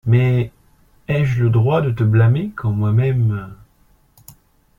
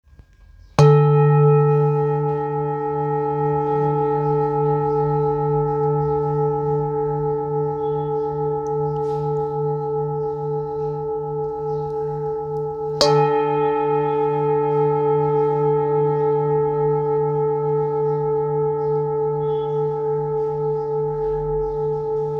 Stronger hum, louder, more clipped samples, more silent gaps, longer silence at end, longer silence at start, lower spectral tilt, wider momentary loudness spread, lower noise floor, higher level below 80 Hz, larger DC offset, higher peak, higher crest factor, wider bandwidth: neither; first, -17 LUFS vs -20 LUFS; neither; neither; first, 1.25 s vs 0 s; second, 0.05 s vs 0.4 s; about the same, -9 dB/octave vs -8 dB/octave; first, 12 LU vs 9 LU; first, -55 dBFS vs -48 dBFS; about the same, -46 dBFS vs -46 dBFS; neither; second, -4 dBFS vs 0 dBFS; second, 14 dB vs 20 dB; second, 4.1 kHz vs 7.6 kHz